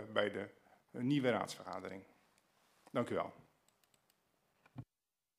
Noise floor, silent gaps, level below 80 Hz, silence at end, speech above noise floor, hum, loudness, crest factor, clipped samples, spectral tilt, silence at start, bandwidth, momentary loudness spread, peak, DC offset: under -90 dBFS; none; -82 dBFS; 0.55 s; over 52 dB; none; -40 LUFS; 24 dB; under 0.1%; -6 dB/octave; 0 s; 15.5 kHz; 21 LU; -18 dBFS; under 0.1%